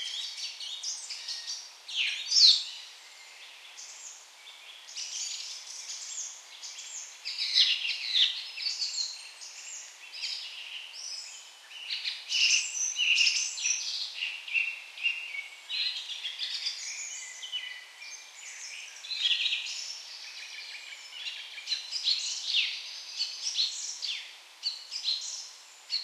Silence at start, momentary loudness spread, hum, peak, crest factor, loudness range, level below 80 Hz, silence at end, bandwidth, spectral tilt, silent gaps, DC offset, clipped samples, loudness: 0 s; 19 LU; none; -6 dBFS; 26 dB; 11 LU; under -90 dBFS; 0 s; 15.5 kHz; 9.5 dB/octave; none; under 0.1%; under 0.1%; -29 LUFS